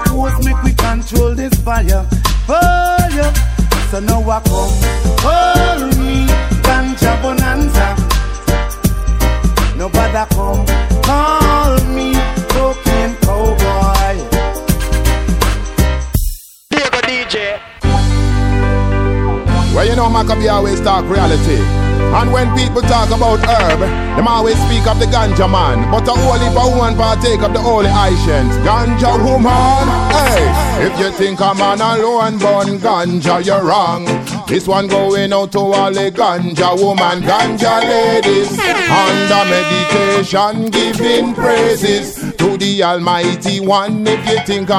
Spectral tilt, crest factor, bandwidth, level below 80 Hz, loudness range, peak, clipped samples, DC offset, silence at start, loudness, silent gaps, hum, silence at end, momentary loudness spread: -5 dB/octave; 12 dB; 16.5 kHz; -18 dBFS; 3 LU; 0 dBFS; under 0.1%; under 0.1%; 0 s; -13 LUFS; none; none; 0 s; 4 LU